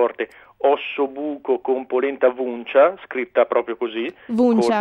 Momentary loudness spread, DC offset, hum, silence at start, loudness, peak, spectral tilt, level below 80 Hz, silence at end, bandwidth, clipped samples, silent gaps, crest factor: 11 LU; under 0.1%; none; 0 s; -21 LUFS; -4 dBFS; -6 dB/octave; -66 dBFS; 0 s; 11 kHz; under 0.1%; none; 16 dB